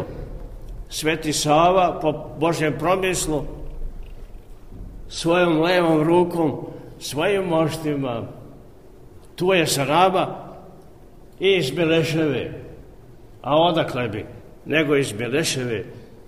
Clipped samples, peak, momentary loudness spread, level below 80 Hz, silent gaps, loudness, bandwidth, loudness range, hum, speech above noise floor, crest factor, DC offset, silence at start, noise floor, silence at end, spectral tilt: under 0.1%; -4 dBFS; 21 LU; -40 dBFS; none; -21 LUFS; 15.5 kHz; 3 LU; none; 26 dB; 18 dB; 0.4%; 0 s; -46 dBFS; 0.05 s; -4.5 dB/octave